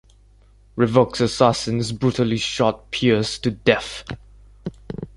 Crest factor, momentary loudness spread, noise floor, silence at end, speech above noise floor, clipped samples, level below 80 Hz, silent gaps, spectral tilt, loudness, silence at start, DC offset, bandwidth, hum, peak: 20 dB; 18 LU; -51 dBFS; 0.1 s; 32 dB; under 0.1%; -46 dBFS; none; -5.5 dB/octave; -20 LUFS; 0.75 s; under 0.1%; 11.5 kHz; none; -2 dBFS